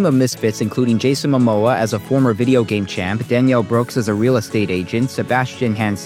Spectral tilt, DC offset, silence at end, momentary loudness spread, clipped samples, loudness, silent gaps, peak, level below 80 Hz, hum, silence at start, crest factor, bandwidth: -6.5 dB/octave; under 0.1%; 0 s; 5 LU; under 0.1%; -17 LUFS; none; -2 dBFS; -56 dBFS; none; 0 s; 14 dB; 16 kHz